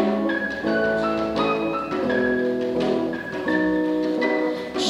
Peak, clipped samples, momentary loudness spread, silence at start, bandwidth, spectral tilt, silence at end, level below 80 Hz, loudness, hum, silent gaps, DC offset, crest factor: -8 dBFS; under 0.1%; 4 LU; 0 s; 12 kHz; -5.5 dB/octave; 0 s; -52 dBFS; -23 LUFS; none; none; under 0.1%; 14 dB